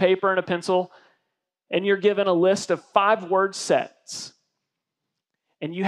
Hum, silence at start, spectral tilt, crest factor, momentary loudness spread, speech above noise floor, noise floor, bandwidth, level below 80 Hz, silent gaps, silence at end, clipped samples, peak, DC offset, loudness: none; 0 s; -4.5 dB/octave; 20 dB; 15 LU; 61 dB; -83 dBFS; 12 kHz; -76 dBFS; none; 0 s; under 0.1%; -4 dBFS; under 0.1%; -22 LUFS